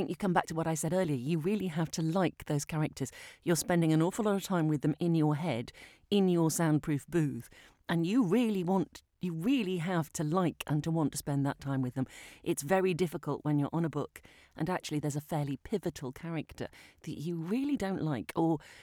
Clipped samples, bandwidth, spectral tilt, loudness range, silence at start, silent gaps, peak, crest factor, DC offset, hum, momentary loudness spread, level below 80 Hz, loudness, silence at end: under 0.1%; 17.5 kHz; -6 dB/octave; 6 LU; 0 s; none; -14 dBFS; 18 dB; under 0.1%; none; 11 LU; -62 dBFS; -32 LUFS; 0 s